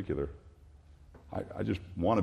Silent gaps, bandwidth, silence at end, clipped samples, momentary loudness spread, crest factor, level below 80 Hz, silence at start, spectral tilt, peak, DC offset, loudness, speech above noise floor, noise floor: none; 11 kHz; 0 s; under 0.1%; 24 LU; 18 dB; -52 dBFS; 0 s; -8.5 dB/octave; -16 dBFS; under 0.1%; -36 LUFS; 24 dB; -56 dBFS